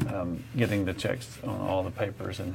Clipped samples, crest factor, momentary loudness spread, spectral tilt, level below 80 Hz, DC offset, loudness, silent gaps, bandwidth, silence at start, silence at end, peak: under 0.1%; 20 dB; 7 LU; -6.5 dB/octave; -54 dBFS; under 0.1%; -31 LUFS; none; 16.5 kHz; 0 s; 0 s; -10 dBFS